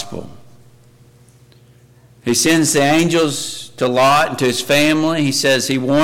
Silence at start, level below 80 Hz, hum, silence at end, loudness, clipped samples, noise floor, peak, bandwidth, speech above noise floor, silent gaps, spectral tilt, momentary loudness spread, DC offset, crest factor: 0 s; -52 dBFS; 60 Hz at -50 dBFS; 0 s; -15 LUFS; under 0.1%; -47 dBFS; -6 dBFS; 17 kHz; 33 dB; none; -3.5 dB/octave; 11 LU; under 0.1%; 10 dB